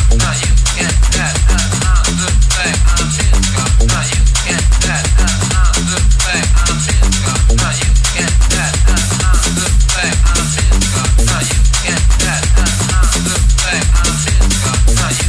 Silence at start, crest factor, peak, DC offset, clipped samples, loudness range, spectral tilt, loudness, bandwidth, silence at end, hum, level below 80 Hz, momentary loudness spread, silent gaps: 0 s; 10 dB; 0 dBFS; under 0.1%; under 0.1%; 0 LU; -3 dB/octave; -12 LUFS; 11 kHz; 0 s; none; -12 dBFS; 1 LU; none